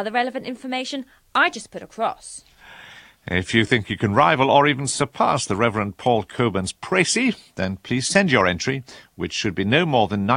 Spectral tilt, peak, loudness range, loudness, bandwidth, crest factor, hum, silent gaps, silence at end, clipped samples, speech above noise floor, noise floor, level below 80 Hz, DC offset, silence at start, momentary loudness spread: -4.5 dB/octave; 0 dBFS; 5 LU; -21 LUFS; 15 kHz; 20 dB; none; none; 0 s; under 0.1%; 24 dB; -45 dBFS; -52 dBFS; under 0.1%; 0 s; 14 LU